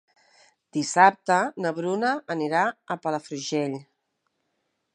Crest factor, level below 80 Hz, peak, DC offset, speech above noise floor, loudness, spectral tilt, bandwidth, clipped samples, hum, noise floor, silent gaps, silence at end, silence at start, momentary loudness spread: 24 dB; -80 dBFS; -2 dBFS; under 0.1%; 52 dB; -25 LUFS; -4 dB/octave; 11.5 kHz; under 0.1%; none; -76 dBFS; none; 1.1 s; 0.75 s; 12 LU